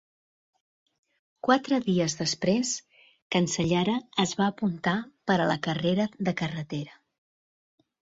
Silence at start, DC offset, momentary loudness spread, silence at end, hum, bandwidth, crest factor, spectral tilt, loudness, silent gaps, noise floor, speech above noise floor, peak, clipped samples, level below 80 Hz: 1.45 s; under 0.1%; 7 LU; 1.3 s; none; 7.8 kHz; 22 dB; -4.5 dB/octave; -27 LUFS; 3.22-3.30 s; under -90 dBFS; over 64 dB; -8 dBFS; under 0.1%; -62 dBFS